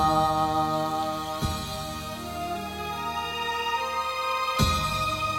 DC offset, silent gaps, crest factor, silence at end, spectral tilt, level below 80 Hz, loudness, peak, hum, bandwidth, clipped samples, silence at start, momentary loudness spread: under 0.1%; none; 18 dB; 0 s; -4 dB/octave; -42 dBFS; -27 LUFS; -8 dBFS; none; 16.5 kHz; under 0.1%; 0 s; 9 LU